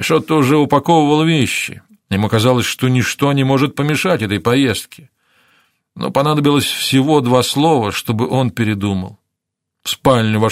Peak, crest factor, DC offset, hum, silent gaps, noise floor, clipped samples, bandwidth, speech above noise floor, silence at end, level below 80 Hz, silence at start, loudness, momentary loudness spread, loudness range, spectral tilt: 0 dBFS; 16 dB; under 0.1%; none; none; -78 dBFS; under 0.1%; 16 kHz; 64 dB; 0 s; -50 dBFS; 0 s; -15 LUFS; 8 LU; 3 LU; -5.5 dB/octave